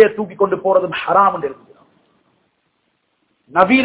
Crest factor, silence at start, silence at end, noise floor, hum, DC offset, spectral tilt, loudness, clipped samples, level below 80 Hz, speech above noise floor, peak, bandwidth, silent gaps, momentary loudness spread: 18 dB; 0 s; 0 s; -66 dBFS; none; under 0.1%; -9 dB/octave; -16 LUFS; 0.2%; -58 dBFS; 52 dB; 0 dBFS; 4 kHz; none; 9 LU